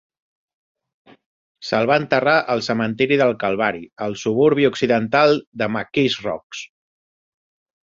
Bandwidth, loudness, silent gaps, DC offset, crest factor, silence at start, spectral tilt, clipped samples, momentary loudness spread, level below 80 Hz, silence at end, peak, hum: 7.6 kHz; -19 LUFS; 5.47-5.52 s, 6.43-6.50 s; under 0.1%; 20 dB; 1.6 s; -5.5 dB/octave; under 0.1%; 12 LU; -60 dBFS; 1.15 s; -2 dBFS; none